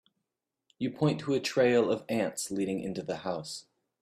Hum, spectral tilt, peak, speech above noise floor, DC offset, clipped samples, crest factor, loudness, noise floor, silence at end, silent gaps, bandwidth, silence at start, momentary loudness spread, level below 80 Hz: none; -5 dB/octave; -14 dBFS; 57 dB; under 0.1%; under 0.1%; 18 dB; -30 LUFS; -86 dBFS; 0.4 s; none; 15 kHz; 0.8 s; 12 LU; -70 dBFS